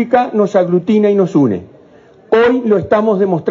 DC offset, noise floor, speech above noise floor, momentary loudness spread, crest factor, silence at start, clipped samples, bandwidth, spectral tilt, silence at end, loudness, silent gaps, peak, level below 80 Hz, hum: under 0.1%; -43 dBFS; 31 dB; 3 LU; 12 dB; 0 s; under 0.1%; 7.6 kHz; -8 dB/octave; 0 s; -13 LUFS; none; 0 dBFS; -52 dBFS; none